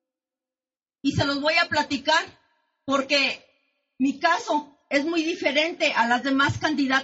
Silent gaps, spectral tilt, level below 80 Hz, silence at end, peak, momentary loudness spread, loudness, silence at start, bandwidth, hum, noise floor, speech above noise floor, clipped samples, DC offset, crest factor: none; -2 dB/octave; -58 dBFS; 0 s; -8 dBFS; 7 LU; -23 LUFS; 1.05 s; 8 kHz; none; under -90 dBFS; over 67 dB; under 0.1%; under 0.1%; 18 dB